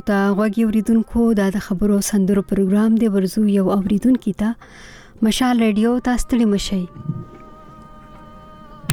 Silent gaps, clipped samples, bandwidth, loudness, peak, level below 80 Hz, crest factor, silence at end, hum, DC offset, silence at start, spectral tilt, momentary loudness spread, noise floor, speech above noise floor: none; under 0.1%; 17.5 kHz; -18 LUFS; 0 dBFS; -38 dBFS; 18 dB; 0 s; none; under 0.1%; 0.05 s; -6 dB/octave; 8 LU; -40 dBFS; 23 dB